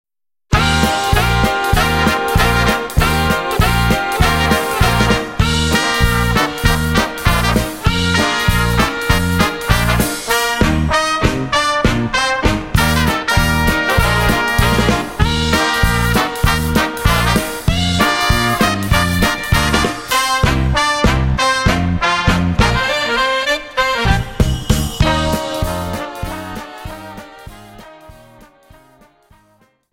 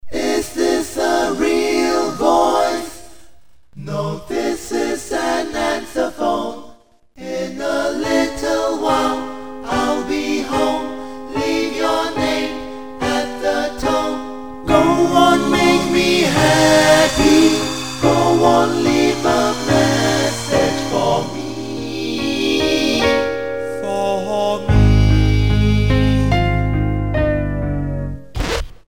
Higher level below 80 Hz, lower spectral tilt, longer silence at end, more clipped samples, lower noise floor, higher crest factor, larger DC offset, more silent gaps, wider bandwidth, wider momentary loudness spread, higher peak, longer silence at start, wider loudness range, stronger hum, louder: first, -22 dBFS vs -28 dBFS; about the same, -4.5 dB/octave vs -5 dB/octave; first, 1.8 s vs 0 s; neither; first, -55 dBFS vs -49 dBFS; about the same, 14 dB vs 16 dB; second, 0.1% vs 1%; neither; about the same, 16.5 kHz vs 17 kHz; second, 4 LU vs 12 LU; about the same, 0 dBFS vs 0 dBFS; first, 0.5 s vs 0 s; second, 4 LU vs 8 LU; neither; about the same, -15 LUFS vs -17 LUFS